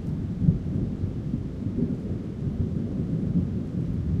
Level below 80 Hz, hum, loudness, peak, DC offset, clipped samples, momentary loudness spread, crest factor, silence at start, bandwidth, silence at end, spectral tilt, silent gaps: -38 dBFS; none; -28 LUFS; -6 dBFS; under 0.1%; under 0.1%; 6 LU; 20 dB; 0 s; 7 kHz; 0 s; -10.5 dB/octave; none